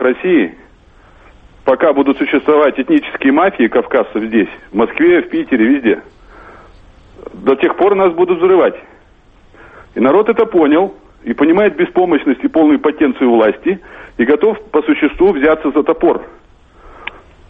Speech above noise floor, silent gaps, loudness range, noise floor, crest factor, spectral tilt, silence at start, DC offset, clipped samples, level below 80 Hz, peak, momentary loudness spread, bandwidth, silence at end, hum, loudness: 33 dB; none; 2 LU; -45 dBFS; 14 dB; -8.5 dB/octave; 0 s; under 0.1%; under 0.1%; -44 dBFS; 0 dBFS; 10 LU; 3.9 kHz; 0.4 s; none; -13 LUFS